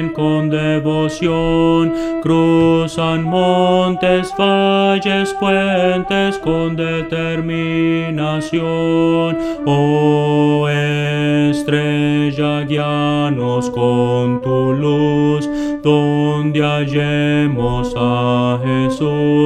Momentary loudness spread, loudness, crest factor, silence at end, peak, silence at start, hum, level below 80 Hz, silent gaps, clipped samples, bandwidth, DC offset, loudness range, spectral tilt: 5 LU; -15 LUFS; 14 dB; 0 s; 0 dBFS; 0 s; none; -40 dBFS; none; under 0.1%; 11 kHz; under 0.1%; 2 LU; -7 dB/octave